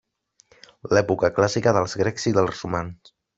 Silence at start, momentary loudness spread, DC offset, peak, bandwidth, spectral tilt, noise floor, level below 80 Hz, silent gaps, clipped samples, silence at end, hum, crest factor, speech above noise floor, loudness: 0.85 s; 9 LU; under 0.1%; -2 dBFS; 8 kHz; -5.5 dB/octave; -60 dBFS; -56 dBFS; none; under 0.1%; 0.45 s; none; 20 dB; 38 dB; -22 LUFS